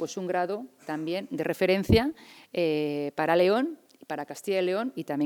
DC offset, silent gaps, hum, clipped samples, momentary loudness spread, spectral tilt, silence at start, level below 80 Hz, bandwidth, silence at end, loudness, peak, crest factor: under 0.1%; none; none; under 0.1%; 14 LU; -6 dB/octave; 0 s; -50 dBFS; 19 kHz; 0 s; -28 LUFS; -8 dBFS; 18 dB